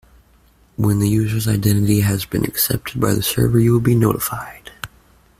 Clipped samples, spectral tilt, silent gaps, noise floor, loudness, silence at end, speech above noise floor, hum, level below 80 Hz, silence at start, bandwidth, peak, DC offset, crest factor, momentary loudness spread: under 0.1%; -6 dB/octave; none; -53 dBFS; -17 LUFS; 0.55 s; 36 dB; none; -40 dBFS; 0.8 s; 16 kHz; -2 dBFS; under 0.1%; 16 dB; 19 LU